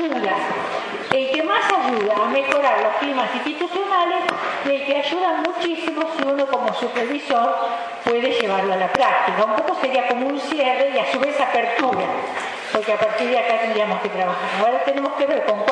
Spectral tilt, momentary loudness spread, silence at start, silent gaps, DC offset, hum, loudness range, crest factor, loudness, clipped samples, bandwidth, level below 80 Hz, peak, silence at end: -4 dB/octave; 5 LU; 0 s; none; under 0.1%; none; 2 LU; 20 dB; -20 LUFS; under 0.1%; 10.5 kHz; -68 dBFS; 0 dBFS; 0 s